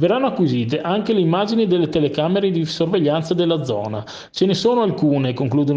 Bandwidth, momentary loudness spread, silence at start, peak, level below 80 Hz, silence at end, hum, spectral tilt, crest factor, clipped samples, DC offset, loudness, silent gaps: 8.2 kHz; 4 LU; 0 s; -6 dBFS; -56 dBFS; 0 s; none; -7 dB/octave; 12 dB; under 0.1%; under 0.1%; -19 LUFS; none